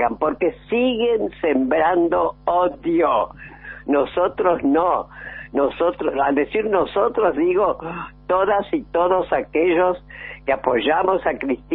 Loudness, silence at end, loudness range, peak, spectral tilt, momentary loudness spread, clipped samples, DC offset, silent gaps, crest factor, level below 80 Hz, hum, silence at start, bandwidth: -20 LUFS; 0 s; 1 LU; -2 dBFS; -3.5 dB/octave; 10 LU; under 0.1%; under 0.1%; none; 18 dB; -48 dBFS; none; 0 s; 4.1 kHz